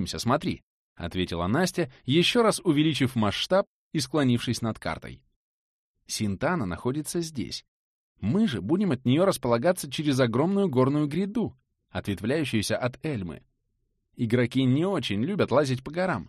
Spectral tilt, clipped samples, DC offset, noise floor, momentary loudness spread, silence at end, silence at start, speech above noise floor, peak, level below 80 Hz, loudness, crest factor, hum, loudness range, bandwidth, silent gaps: -5.5 dB/octave; under 0.1%; under 0.1%; -75 dBFS; 11 LU; 0.05 s; 0 s; 50 dB; -10 dBFS; -54 dBFS; -26 LUFS; 18 dB; none; 6 LU; 13 kHz; 0.63-0.96 s, 3.67-3.91 s, 5.36-5.94 s, 7.68-8.15 s